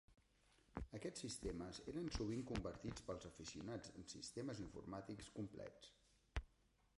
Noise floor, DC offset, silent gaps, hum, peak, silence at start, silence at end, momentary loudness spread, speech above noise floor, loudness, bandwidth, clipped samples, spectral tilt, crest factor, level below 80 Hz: -78 dBFS; under 0.1%; none; none; -28 dBFS; 0.1 s; 0.5 s; 9 LU; 28 dB; -51 LUFS; 11.5 kHz; under 0.1%; -5 dB/octave; 24 dB; -60 dBFS